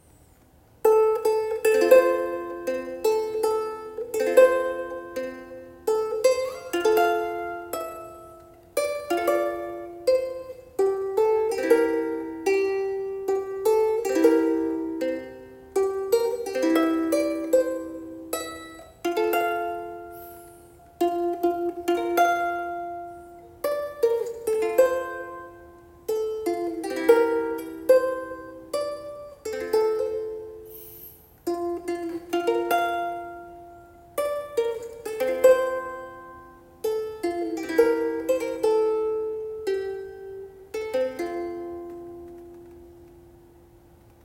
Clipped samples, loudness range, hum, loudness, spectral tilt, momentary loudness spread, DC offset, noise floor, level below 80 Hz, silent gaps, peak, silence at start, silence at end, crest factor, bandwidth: under 0.1%; 6 LU; none; -25 LUFS; -4 dB/octave; 19 LU; under 0.1%; -56 dBFS; -60 dBFS; none; -4 dBFS; 0.85 s; 1.05 s; 22 dB; 17 kHz